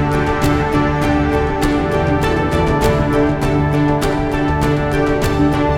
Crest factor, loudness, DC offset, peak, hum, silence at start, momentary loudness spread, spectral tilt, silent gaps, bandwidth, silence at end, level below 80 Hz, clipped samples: 14 dB; -16 LUFS; under 0.1%; -2 dBFS; none; 0 s; 2 LU; -7 dB/octave; none; 17.5 kHz; 0 s; -26 dBFS; under 0.1%